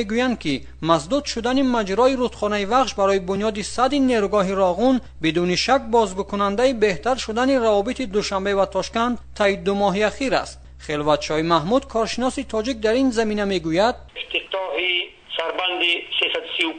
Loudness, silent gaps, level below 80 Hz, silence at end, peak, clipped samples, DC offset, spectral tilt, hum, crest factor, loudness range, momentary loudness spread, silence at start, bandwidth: -21 LUFS; none; -44 dBFS; 0 s; -2 dBFS; under 0.1%; under 0.1%; -4.5 dB/octave; none; 18 dB; 2 LU; 6 LU; 0 s; 9.4 kHz